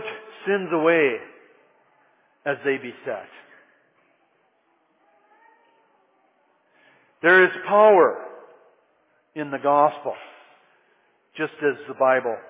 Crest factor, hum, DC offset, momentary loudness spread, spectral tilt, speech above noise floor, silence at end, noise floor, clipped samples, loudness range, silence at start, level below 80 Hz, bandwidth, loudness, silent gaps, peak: 20 dB; none; under 0.1%; 20 LU; -8.5 dB/octave; 46 dB; 0.1 s; -66 dBFS; under 0.1%; 13 LU; 0 s; -80 dBFS; 4 kHz; -21 LUFS; none; -4 dBFS